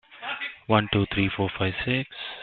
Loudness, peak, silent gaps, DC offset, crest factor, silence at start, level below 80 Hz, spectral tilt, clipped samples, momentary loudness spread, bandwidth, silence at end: -26 LUFS; -6 dBFS; none; under 0.1%; 22 dB; 0.1 s; -50 dBFS; -10 dB/octave; under 0.1%; 10 LU; 4.5 kHz; 0 s